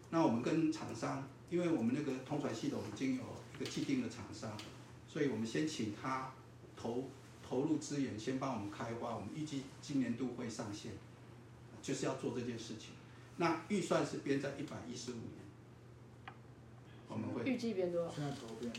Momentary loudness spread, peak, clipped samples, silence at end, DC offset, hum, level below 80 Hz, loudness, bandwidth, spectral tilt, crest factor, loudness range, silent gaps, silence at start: 19 LU; -20 dBFS; under 0.1%; 0 s; under 0.1%; none; -74 dBFS; -40 LUFS; 14 kHz; -5.5 dB/octave; 20 dB; 4 LU; none; 0 s